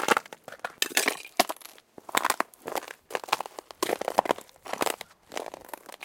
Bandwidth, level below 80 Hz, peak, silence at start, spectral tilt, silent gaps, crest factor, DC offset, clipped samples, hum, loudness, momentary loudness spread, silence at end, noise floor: 17 kHz; -74 dBFS; -2 dBFS; 0 s; -1 dB/octave; none; 28 dB; under 0.1%; under 0.1%; none; -30 LUFS; 15 LU; 0 s; -50 dBFS